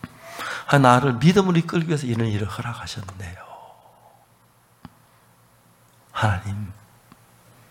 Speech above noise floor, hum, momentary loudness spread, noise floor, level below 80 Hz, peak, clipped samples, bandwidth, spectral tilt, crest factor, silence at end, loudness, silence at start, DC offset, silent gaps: 37 dB; none; 21 LU; -58 dBFS; -54 dBFS; -2 dBFS; under 0.1%; 16.5 kHz; -6.5 dB/octave; 22 dB; 1 s; -21 LUFS; 0.05 s; under 0.1%; none